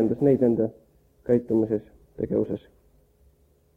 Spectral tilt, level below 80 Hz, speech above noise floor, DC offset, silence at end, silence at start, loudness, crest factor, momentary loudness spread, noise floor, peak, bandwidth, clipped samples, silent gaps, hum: -11 dB/octave; -56 dBFS; 38 dB; under 0.1%; 1.2 s; 0 s; -25 LUFS; 16 dB; 13 LU; -61 dBFS; -8 dBFS; 3.8 kHz; under 0.1%; none; none